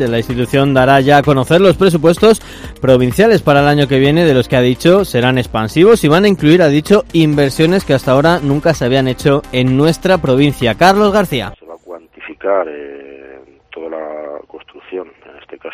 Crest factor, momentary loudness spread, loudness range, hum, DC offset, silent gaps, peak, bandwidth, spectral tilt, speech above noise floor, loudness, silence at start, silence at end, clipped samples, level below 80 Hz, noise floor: 12 dB; 18 LU; 13 LU; none; under 0.1%; none; 0 dBFS; 16 kHz; -6.5 dB/octave; 28 dB; -11 LUFS; 0 s; 0 s; 0.4%; -36 dBFS; -39 dBFS